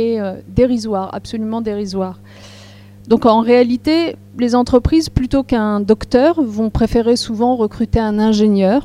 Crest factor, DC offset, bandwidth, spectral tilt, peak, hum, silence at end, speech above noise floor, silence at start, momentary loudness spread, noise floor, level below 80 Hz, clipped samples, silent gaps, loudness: 14 dB; under 0.1%; 12.5 kHz; -6.5 dB/octave; 0 dBFS; 50 Hz at -40 dBFS; 0 s; 24 dB; 0 s; 9 LU; -39 dBFS; -32 dBFS; under 0.1%; none; -15 LUFS